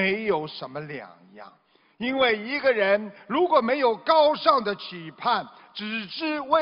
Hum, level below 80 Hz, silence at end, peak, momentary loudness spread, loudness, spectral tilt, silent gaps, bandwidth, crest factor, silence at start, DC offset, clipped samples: none; -68 dBFS; 0 s; -4 dBFS; 16 LU; -24 LUFS; -7.5 dB/octave; none; 5.6 kHz; 20 dB; 0 s; under 0.1%; under 0.1%